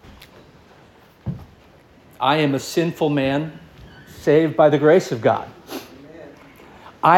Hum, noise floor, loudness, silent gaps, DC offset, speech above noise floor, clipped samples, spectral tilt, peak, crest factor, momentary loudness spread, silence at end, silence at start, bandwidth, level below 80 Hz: none; -50 dBFS; -18 LUFS; none; under 0.1%; 32 dB; under 0.1%; -6 dB/octave; -2 dBFS; 20 dB; 21 LU; 0 s; 1.25 s; 17 kHz; -54 dBFS